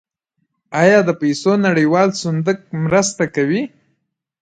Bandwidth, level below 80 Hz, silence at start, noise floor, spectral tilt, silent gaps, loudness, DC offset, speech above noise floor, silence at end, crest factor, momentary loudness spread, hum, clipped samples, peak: 9.4 kHz; -56 dBFS; 0.7 s; -71 dBFS; -5.5 dB/octave; none; -16 LUFS; under 0.1%; 56 dB; 0.75 s; 16 dB; 9 LU; none; under 0.1%; 0 dBFS